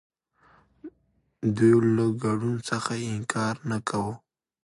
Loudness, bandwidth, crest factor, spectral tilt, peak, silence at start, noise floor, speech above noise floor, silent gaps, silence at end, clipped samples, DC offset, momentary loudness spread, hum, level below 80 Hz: -26 LUFS; 11.5 kHz; 18 dB; -6.5 dB/octave; -8 dBFS; 0.85 s; -69 dBFS; 45 dB; none; 0.45 s; under 0.1%; under 0.1%; 11 LU; none; -60 dBFS